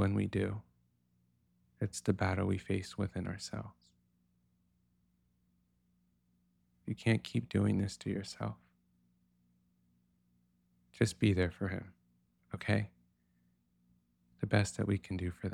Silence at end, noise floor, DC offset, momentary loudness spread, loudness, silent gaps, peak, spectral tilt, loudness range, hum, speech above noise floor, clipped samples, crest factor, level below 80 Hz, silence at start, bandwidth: 0 s; -75 dBFS; under 0.1%; 12 LU; -36 LUFS; none; -14 dBFS; -6.5 dB/octave; 8 LU; 60 Hz at -65 dBFS; 41 dB; under 0.1%; 24 dB; -62 dBFS; 0 s; 12 kHz